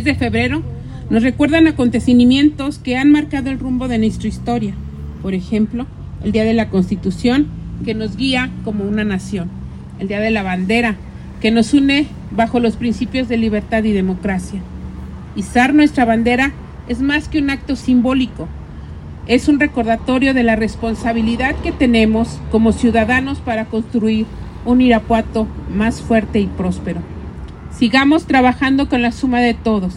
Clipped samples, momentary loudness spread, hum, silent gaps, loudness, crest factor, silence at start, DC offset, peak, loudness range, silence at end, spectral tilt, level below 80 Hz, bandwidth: under 0.1%; 15 LU; none; none; -16 LUFS; 16 dB; 0 s; under 0.1%; 0 dBFS; 5 LU; 0 s; -6 dB/octave; -34 dBFS; 11.5 kHz